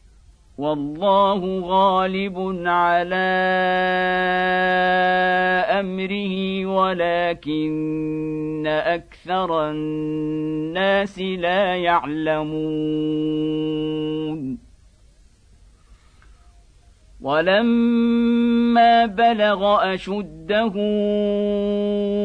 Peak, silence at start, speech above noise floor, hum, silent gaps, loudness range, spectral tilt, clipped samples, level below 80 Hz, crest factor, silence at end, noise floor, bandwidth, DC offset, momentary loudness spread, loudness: -4 dBFS; 0.6 s; 32 dB; none; none; 8 LU; -7 dB/octave; under 0.1%; -50 dBFS; 16 dB; 0 s; -52 dBFS; 9.4 kHz; under 0.1%; 8 LU; -20 LUFS